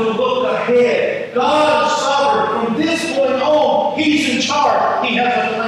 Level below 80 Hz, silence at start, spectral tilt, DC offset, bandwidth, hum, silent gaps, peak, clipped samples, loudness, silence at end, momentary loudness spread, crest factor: -64 dBFS; 0 s; -3.5 dB/octave; under 0.1%; 12.5 kHz; none; none; -2 dBFS; under 0.1%; -15 LUFS; 0 s; 4 LU; 12 dB